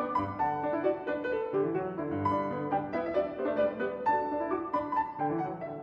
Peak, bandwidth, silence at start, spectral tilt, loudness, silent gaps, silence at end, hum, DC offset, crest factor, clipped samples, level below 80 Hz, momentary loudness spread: -16 dBFS; 6.6 kHz; 0 s; -9 dB/octave; -32 LUFS; none; 0 s; none; under 0.1%; 14 dB; under 0.1%; -62 dBFS; 3 LU